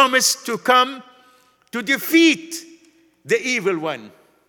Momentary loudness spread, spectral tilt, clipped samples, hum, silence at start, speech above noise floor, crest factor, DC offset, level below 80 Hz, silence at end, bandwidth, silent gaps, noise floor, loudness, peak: 18 LU; -2 dB/octave; under 0.1%; none; 0 s; 36 dB; 20 dB; under 0.1%; -74 dBFS; 0.4 s; 19 kHz; none; -55 dBFS; -18 LUFS; 0 dBFS